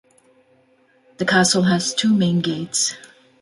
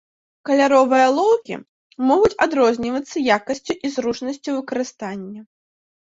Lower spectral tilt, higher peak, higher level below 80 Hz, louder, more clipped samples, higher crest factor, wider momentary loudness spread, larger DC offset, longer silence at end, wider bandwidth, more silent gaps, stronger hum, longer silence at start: about the same, -3.5 dB/octave vs -4.5 dB/octave; about the same, -2 dBFS vs -2 dBFS; about the same, -60 dBFS vs -56 dBFS; about the same, -18 LUFS vs -19 LUFS; neither; about the same, 18 dB vs 18 dB; second, 7 LU vs 17 LU; neither; second, 0.45 s vs 0.7 s; first, 11.5 kHz vs 8 kHz; second, none vs 1.69-1.90 s; neither; first, 1.2 s vs 0.45 s